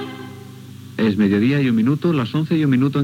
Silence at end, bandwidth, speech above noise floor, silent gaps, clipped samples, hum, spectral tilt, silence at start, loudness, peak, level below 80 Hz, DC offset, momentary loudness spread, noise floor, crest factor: 0 s; 16 kHz; 20 dB; none; under 0.1%; 50 Hz at -35 dBFS; -8 dB/octave; 0 s; -18 LUFS; -6 dBFS; -64 dBFS; under 0.1%; 20 LU; -37 dBFS; 12 dB